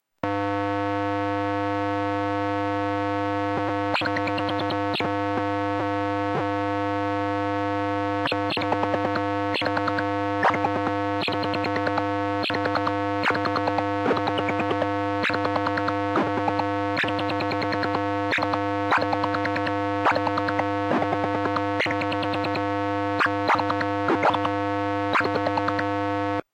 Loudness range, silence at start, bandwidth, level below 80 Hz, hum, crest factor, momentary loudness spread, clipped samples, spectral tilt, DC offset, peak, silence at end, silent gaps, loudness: 2 LU; 0.25 s; 9.8 kHz; -60 dBFS; none; 16 dB; 3 LU; under 0.1%; -6.5 dB/octave; under 0.1%; -8 dBFS; 0.15 s; none; -25 LUFS